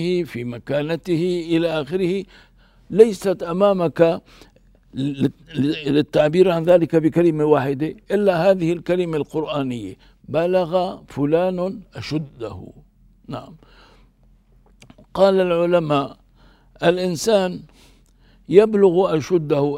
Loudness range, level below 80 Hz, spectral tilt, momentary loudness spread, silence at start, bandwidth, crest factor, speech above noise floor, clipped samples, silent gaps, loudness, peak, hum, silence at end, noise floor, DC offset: 7 LU; -52 dBFS; -6.5 dB/octave; 15 LU; 0 s; 15.5 kHz; 20 dB; 35 dB; under 0.1%; none; -19 LUFS; 0 dBFS; none; 0 s; -54 dBFS; under 0.1%